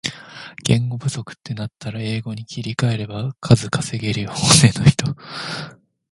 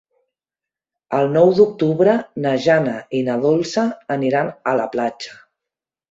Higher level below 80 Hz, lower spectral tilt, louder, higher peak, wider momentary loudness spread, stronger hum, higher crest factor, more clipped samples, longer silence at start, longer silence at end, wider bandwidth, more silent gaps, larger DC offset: first, -44 dBFS vs -62 dBFS; second, -4.5 dB/octave vs -6.5 dB/octave; about the same, -19 LUFS vs -18 LUFS; about the same, 0 dBFS vs -2 dBFS; first, 17 LU vs 9 LU; neither; about the same, 20 dB vs 16 dB; neither; second, 0.05 s vs 1.1 s; second, 0.4 s vs 0.75 s; first, 11.5 kHz vs 7.8 kHz; neither; neither